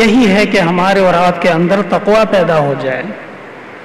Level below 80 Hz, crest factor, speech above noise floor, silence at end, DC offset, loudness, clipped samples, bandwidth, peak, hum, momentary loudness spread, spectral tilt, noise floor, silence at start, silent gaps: -42 dBFS; 8 dB; 20 dB; 0 s; under 0.1%; -11 LUFS; under 0.1%; 14 kHz; -4 dBFS; none; 17 LU; -6 dB/octave; -31 dBFS; 0 s; none